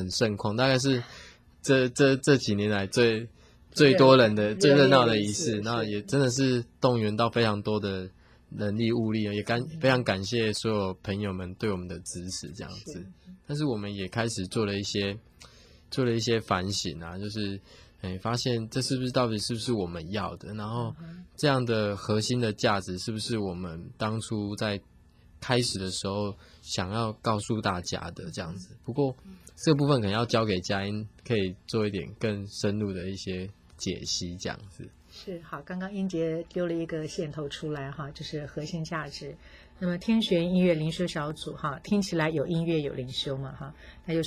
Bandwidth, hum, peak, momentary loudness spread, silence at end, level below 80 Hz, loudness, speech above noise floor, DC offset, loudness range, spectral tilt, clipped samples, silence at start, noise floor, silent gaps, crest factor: 16 kHz; none; -6 dBFS; 14 LU; 0 s; -52 dBFS; -28 LUFS; 28 dB; under 0.1%; 11 LU; -5 dB/octave; under 0.1%; 0 s; -56 dBFS; none; 22 dB